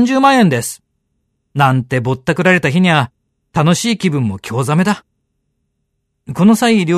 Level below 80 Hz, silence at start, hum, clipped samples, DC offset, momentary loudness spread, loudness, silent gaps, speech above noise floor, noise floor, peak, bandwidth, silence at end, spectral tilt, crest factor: -52 dBFS; 0 s; none; under 0.1%; under 0.1%; 13 LU; -14 LUFS; none; 56 dB; -69 dBFS; 0 dBFS; 13.5 kHz; 0 s; -5.5 dB/octave; 14 dB